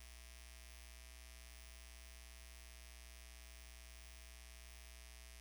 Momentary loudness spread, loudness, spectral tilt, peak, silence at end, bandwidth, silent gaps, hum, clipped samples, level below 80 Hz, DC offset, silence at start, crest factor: 0 LU; -57 LUFS; -2 dB/octave; -38 dBFS; 0 s; over 20 kHz; none; 60 Hz at -60 dBFS; under 0.1%; -58 dBFS; under 0.1%; 0 s; 18 dB